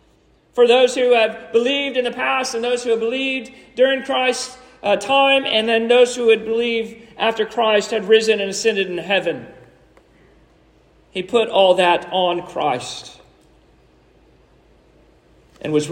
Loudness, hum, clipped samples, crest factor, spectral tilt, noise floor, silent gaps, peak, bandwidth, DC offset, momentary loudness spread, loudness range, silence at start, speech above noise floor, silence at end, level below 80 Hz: -17 LUFS; none; under 0.1%; 18 dB; -3 dB/octave; -56 dBFS; none; -2 dBFS; 10.5 kHz; under 0.1%; 12 LU; 6 LU; 0.55 s; 38 dB; 0 s; -58 dBFS